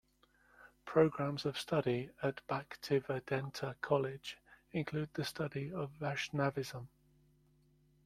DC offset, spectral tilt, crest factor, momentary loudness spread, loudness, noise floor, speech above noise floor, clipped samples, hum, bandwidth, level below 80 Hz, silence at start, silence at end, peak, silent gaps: under 0.1%; -6 dB/octave; 22 dB; 12 LU; -38 LUFS; -71 dBFS; 34 dB; under 0.1%; none; 15 kHz; -70 dBFS; 0.6 s; 1.2 s; -16 dBFS; none